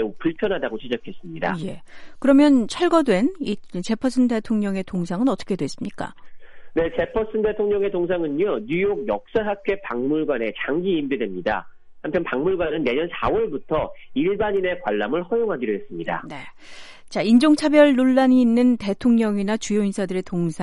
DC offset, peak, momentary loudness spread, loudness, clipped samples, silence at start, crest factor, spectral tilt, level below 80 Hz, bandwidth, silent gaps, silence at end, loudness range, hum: under 0.1%; -2 dBFS; 13 LU; -22 LUFS; under 0.1%; 0 s; 20 dB; -6 dB/octave; -48 dBFS; 11.5 kHz; none; 0 s; 7 LU; none